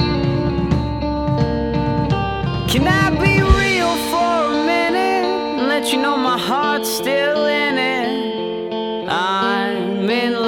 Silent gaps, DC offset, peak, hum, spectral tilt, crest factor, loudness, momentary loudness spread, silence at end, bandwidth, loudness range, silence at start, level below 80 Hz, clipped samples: none; under 0.1%; 0 dBFS; none; -5.5 dB/octave; 18 dB; -18 LUFS; 7 LU; 0 s; 18 kHz; 2 LU; 0 s; -30 dBFS; under 0.1%